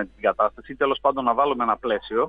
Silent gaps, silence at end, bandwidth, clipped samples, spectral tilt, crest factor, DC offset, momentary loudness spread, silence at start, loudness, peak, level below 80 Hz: none; 0 s; 4.9 kHz; under 0.1%; -7 dB/octave; 16 dB; under 0.1%; 4 LU; 0 s; -23 LUFS; -6 dBFS; -52 dBFS